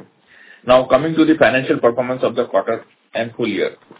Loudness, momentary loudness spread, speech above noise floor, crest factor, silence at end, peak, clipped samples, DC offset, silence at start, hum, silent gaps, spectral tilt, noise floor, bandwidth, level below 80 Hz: -17 LUFS; 12 LU; 31 dB; 16 dB; 0.25 s; 0 dBFS; under 0.1%; under 0.1%; 0.65 s; none; none; -10 dB/octave; -47 dBFS; 4 kHz; -52 dBFS